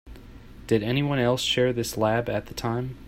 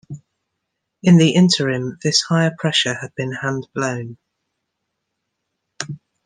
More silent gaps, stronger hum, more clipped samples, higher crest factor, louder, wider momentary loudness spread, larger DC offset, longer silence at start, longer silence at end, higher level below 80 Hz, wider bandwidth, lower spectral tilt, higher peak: neither; neither; neither; about the same, 18 dB vs 18 dB; second, -25 LUFS vs -17 LUFS; second, 7 LU vs 18 LU; neither; about the same, 0.05 s vs 0.1 s; second, 0 s vs 0.3 s; first, -48 dBFS vs -62 dBFS; first, 16 kHz vs 9.8 kHz; about the same, -5 dB/octave vs -5 dB/octave; second, -8 dBFS vs -2 dBFS